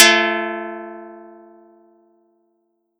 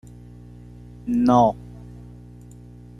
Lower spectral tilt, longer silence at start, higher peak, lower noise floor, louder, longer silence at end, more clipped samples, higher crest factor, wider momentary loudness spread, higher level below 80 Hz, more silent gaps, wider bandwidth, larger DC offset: second, -0.5 dB/octave vs -8 dB/octave; second, 0 s vs 1.05 s; first, 0 dBFS vs -4 dBFS; first, -68 dBFS vs -43 dBFS; about the same, -17 LUFS vs -19 LUFS; first, 1.75 s vs 1 s; neither; about the same, 22 dB vs 20 dB; about the same, 26 LU vs 27 LU; second, -84 dBFS vs -46 dBFS; neither; first, 19 kHz vs 10.5 kHz; neither